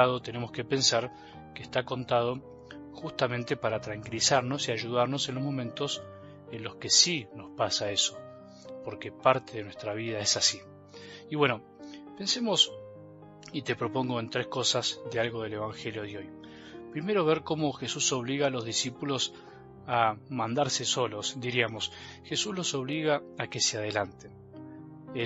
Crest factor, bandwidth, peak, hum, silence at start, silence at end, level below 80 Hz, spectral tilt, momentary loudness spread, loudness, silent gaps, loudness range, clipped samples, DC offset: 24 dB; 8.2 kHz; -6 dBFS; none; 0 s; 0 s; -66 dBFS; -3 dB/octave; 21 LU; -29 LUFS; none; 4 LU; under 0.1%; under 0.1%